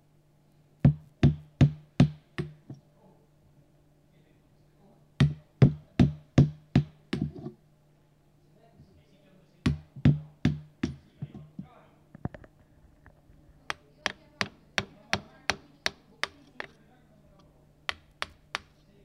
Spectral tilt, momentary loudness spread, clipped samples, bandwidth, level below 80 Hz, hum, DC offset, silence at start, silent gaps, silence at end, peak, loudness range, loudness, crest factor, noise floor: -6.5 dB/octave; 19 LU; under 0.1%; 11 kHz; -46 dBFS; none; under 0.1%; 0.85 s; none; 0.5 s; -6 dBFS; 12 LU; -30 LUFS; 24 dB; -63 dBFS